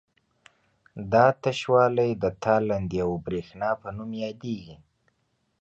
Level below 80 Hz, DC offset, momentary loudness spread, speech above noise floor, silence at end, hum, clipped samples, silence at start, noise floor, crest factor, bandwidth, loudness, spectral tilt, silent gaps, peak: -54 dBFS; under 0.1%; 14 LU; 48 dB; 0.85 s; none; under 0.1%; 0.95 s; -73 dBFS; 20 dB; 8.2 kHz; -25 LUFS; -7 dB/octave; none; -6 dBFS